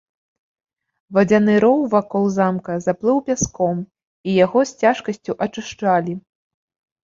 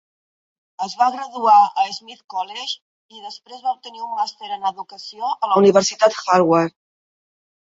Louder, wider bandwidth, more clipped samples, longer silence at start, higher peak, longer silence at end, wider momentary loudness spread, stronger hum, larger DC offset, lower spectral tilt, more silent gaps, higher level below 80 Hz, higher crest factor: about the same, -19 LUFS vs -19 LUFS; about the same, 7.6 kHz vs 7.8 kHz; neither; first, 1.1 s vs 0.8 s; about the same, -2 dBFS vs -2 dBFS; second, 0.85 s vs 1.05 s; second, 11 LU vs 19 LU; neither; neither; first, -5.5 dB/octave vs -4 dB/octave; second, 4.04-4.24 s vs 2.24-2.28 s, 2.82-3.09 s; first, -52 dBFS vs -70 dBFS; about the same, 18 dB vs 18 dB